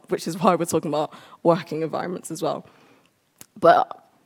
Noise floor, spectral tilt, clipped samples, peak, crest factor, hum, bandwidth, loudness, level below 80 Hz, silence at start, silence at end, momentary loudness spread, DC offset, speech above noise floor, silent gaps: -60 dBFS; -5.5 dB/octave; under 0.1%; -2 dBFS; 22 dB; none; 18.5 kHz; -23 LUFS; -72 dBFS; 0.1 s; 0.4 s; 13 LU; under 0.1%; 38 dB; none